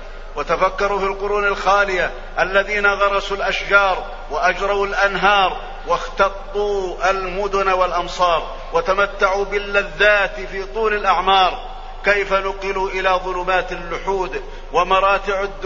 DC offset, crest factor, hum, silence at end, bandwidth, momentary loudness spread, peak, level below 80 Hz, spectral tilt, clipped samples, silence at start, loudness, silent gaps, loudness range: under 0.1%; 18 dB; none; 0 s; 7.6 kHz; 8 LU; 0 dBFS; -32 dBFS; -3.5 dB/octave; under 0.1%; 0 s; -18 LUFS; none; 2 LU